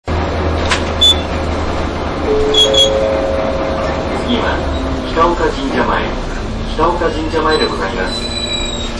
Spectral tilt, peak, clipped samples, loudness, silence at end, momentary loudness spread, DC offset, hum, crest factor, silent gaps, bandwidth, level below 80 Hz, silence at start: -4 dB/octave; -2 dBFS; under 0.1%; -14 LUFS; 0 s; 9 LU; 0.3%; none; 12 dB; none; 11 kHz; -24 dBFS; 0.05 s